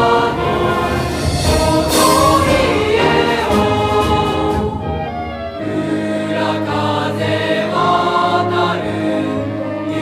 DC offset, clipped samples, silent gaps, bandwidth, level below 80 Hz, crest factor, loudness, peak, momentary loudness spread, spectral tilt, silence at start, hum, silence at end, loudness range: under 0.1%; under 0.1%; none; 15.5 kHz; -32 dBFS; 14 dB; -15 LUFS; 0 dBFS; 9 LU; -5 dB/octave; 0 s; none; 0 s; 5 LU